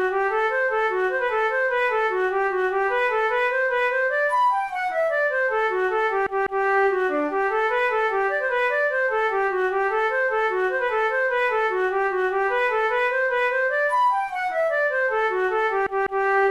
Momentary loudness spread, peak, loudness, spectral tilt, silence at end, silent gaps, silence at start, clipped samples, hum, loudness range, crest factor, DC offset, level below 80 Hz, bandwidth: 2 LU; -12 dBFS; -22 LUFS; -3.5 dB/octave; 0 s; none; 0 s; under 0.1%; none; 0 LU; 10 dB; 0.1%; -56 dBFS; 12 kHz